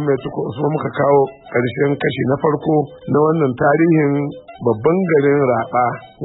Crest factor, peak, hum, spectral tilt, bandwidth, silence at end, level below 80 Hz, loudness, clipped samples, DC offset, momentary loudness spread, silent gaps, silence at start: 12 dB; -4 dBFS; none; -13 dB/octave; 4 kHz; 0 s; -54 dBFS; -17 LUFS; under 0.1%; under 0.1%; 7 LU; none; 0 s